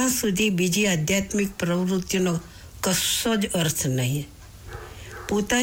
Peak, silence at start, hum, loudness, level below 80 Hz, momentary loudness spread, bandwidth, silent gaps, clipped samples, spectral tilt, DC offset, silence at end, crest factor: -12 dBFS; 0 s; none; -23 LUFS; -48 dBFS; 18 LU; 19.5 kHz; none; under 0.1%; -4 dB/octave; under 0.1%; 0 s; 12 dB